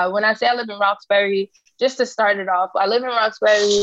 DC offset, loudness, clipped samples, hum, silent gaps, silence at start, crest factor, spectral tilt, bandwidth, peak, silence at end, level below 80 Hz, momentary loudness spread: under 0.1%; -19 LUFS; under 0.1%; none; none; 0 s; 14 dB; -2.5 dB/octave; 8.2 kHz; -4 dBFS; 0 s; -72 dBFS; 6 LU